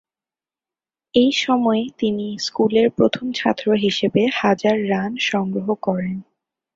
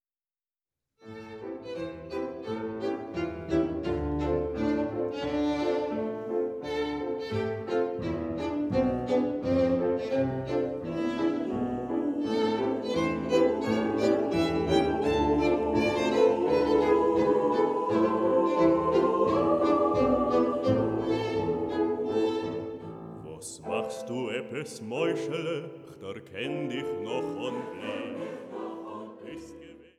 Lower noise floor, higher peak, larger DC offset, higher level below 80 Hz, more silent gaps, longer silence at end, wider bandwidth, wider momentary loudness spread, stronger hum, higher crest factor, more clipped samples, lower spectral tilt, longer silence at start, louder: about the same, under -90 dBFS vs under -90 dBFS; first, -2 dBFS vs -10 dBFS; neither; second, -58 dBFS vs -50 dBFS; neither; first, 0.55 s vs 0.15 s; second, 7.8 kHz vs 12 kHz; second, 6 LU vs 14 LU; neither; about the same, 18 dB vs 18 dB; neither; about the same, -5.5 dB/octave vs -6.5 dB/octave; about the same, 1.15 s vs 1.05 s; first, -19 LUFS vs -28 LUFS